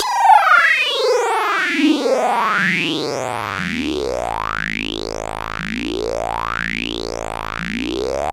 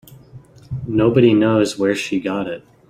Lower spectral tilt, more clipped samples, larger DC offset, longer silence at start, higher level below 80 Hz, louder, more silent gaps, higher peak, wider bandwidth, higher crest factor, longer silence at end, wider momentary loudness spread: second, -3.5 dB/octave vs -6.5 dB/octave; neither; neither; about the same, 0 s vs 0.1 s; first, -40 dBFS vs -48 dBFS; about the same, -18 LUFS vs -17 LUFS; neither; about the same, 0 dBFS vs -2 dBFS; about the same, 16.5 kHz vs 15 kHz; about the same, 18 dB vs 16 dB; second, 0 s vs 0.3 s; about the same, 13 LU vs 15 LU